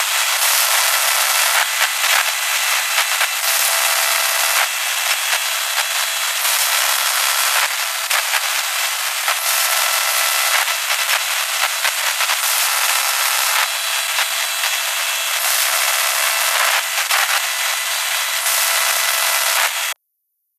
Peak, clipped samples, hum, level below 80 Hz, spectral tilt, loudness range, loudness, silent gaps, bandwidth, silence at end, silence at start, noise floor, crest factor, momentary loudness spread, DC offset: 0 dBFS; under 0.1%; none; under -90 dBFS; 9 dB/octave; 1 LU; -15 LUFS; none; 15 kHz; 0.65 s; 0 s; -72 dBFS; 18 dB; 4 LU; under 0.1%